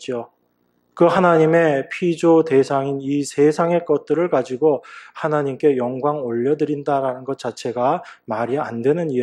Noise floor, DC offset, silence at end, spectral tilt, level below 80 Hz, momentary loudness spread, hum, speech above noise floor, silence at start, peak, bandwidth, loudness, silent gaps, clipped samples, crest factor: -65 dBFS; under 0.1%; 0 s; -7 dB/octave; -66 dBFS; 11 LU; 60 Hz at -55 dBFS; 46 dB; 0 s; -2 dBFS; 11 kHz; -19 LUFS; none; under 0.1%; 18 dB